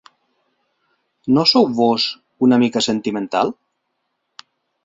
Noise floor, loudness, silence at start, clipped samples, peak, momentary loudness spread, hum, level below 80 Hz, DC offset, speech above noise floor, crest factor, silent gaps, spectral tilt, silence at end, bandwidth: -73 dBFS; -17 LUFS; 1.25 s; under 0.1%; -2 dBFS; 9 LU; none; -62 dBFS; under 0.1%; 57 dB; 18 dB; none; -5 dB/octave; 1.35 s; 7.8 kHz